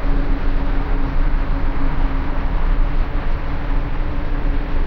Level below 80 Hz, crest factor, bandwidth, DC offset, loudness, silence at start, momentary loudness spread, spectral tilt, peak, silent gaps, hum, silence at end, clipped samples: -16 dBFS; 10 dB; 4.9 kHz; under 0.1%; -24 LUFS; 0 s; 2 LU; -8.5 dB/octave; -6 dBFS; none; none; 0 s; under 0.1%